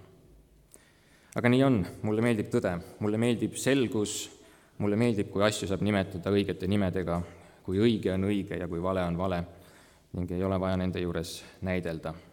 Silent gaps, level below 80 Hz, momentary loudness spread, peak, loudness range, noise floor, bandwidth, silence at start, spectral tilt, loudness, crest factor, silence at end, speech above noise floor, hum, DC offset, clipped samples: none; -56 dBFS; 10 LU; -10 dBFS; 4 LU; -60 dBFS; 18.5 kHz; 1.35 s; -6 dB/octave; -29 LUFS; 20 dB; 0.1 s; 32 dB; none; under 0.1%; under 0.1%